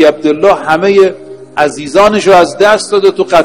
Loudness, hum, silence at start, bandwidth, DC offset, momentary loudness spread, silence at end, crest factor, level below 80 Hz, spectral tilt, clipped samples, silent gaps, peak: -8 LUFS; none; 0 s; 12 kHz; 0.6%; 7 LU; 0 s; 8 dB; -44 dBFS; -4.5 dB/octave; 3%; none; 0 dBFS